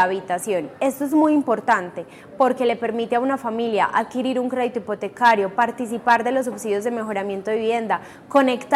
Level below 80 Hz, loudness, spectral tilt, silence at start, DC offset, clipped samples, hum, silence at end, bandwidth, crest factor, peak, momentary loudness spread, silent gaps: -66 dBFS; -21 LUFS; -4.5 dB/octave; 0 s; under 0.1%; under 0.1%; none; 0 s; 15.5 kHz; 18 dB; -4 dBFS; 8 LU; none